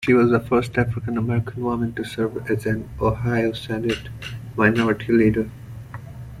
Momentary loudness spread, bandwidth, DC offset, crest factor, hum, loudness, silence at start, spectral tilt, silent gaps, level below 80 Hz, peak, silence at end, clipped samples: 16 LU; 14.5 kHz; under 0.1%; 18 dB; none; -22 LUFS; 0 s; -7.5 dB/octave; none; -42 dBFS; -4 dBFS; 0 s; under 0.1%